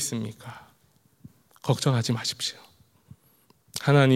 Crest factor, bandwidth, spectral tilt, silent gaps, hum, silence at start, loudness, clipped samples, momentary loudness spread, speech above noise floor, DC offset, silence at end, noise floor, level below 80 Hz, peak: 22 dB; 15.5 kHz; -5 dB/octave; none; none; 0 s; -27 LUFS; under 0.1%; 21 LU; 39 dB; under 0.1%; 0 s; -63 dBFS; -68 dBFS; -6 dBFS